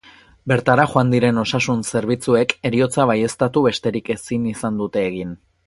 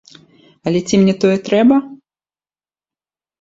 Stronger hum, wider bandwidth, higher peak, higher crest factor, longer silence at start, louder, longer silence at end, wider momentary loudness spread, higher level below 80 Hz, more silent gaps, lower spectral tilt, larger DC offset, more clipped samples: neither; first, 11.5 kHz vs 7.8 kHz; about the same, 0 dBFS vs 0 dBFS; about the same, 18 dB vs 16 dB; second, 0.45 s vs 0.65 s; second, -19 LUFS vs -14 LUFS; second, 0.3 s vs 1.45 s; about the same, 8 LU vs 7 LU; first, -50 dBFS vs -56 dBFS; neither; about the same, -5.5 dB/octave vs -6 dB/octave; neither; neither